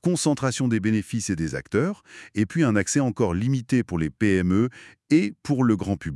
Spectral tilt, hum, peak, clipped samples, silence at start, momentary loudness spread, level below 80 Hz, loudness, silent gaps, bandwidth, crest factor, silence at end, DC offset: -6 dB/octave; none; -8 dBFS; under 0.1%; 0.05 s; 6 LU; -52 dBFS; -24 LUFS; none; 12 kHz; 16 dB; 0 s; under 0.1%